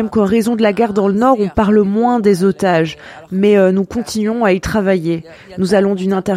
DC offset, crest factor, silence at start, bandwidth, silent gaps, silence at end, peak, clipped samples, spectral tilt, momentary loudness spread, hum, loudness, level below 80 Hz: under 0.1%; 14 dB; 0 s; 15 kHz; none; 0 s; 0 dBFS; under 0.1%; -6.5 dB/octave; 9 LU; none; -14 LUFS; -40 dBFS